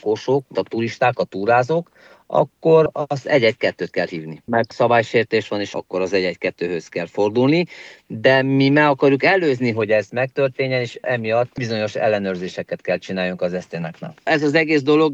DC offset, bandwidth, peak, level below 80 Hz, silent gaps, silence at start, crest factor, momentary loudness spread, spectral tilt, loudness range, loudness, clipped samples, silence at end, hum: under 0.1%; 8 kHz; -2 dBFS; -64 dBFS; none; 0.05 s; 18 dB; 11 LU; -6.5 dB/octave; 4 LU; -19 LUFS; under 0.1%; 0 s; none